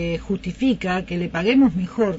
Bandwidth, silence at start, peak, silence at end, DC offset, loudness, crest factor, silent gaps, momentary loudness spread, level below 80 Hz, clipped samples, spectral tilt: 7.8 kHz; 0 s; -6 dBFS; 0 s; under 0.1%; -21 LUFS; 14 dB; none; 9 LU; -42 dBFS; under 0.1%; -7 dB/octave